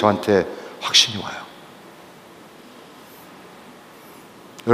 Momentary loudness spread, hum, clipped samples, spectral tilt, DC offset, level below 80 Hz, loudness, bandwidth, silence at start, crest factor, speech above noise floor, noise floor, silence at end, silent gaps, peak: 29 LU; none; under 0.1%; -3 dB/octave; under 0.1%; -64 dBFS; -19 LUFS; 15.5 kHz; 0 s; 24 dB; 25 dB; -44 dBFS; 0 s; none; 0 dBFS